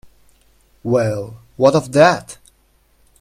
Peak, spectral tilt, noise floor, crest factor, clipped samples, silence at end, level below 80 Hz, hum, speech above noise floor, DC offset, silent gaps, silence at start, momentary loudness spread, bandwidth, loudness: 0 dBFS; -6 dB/octave; -57 dBFS; 18 dB; under 0.1%; 0.9 s; -52 dBFS; none; 42 dB; under 0.1%; none; 0.85 s; 19 LU; 15 kHz; -16 LUFS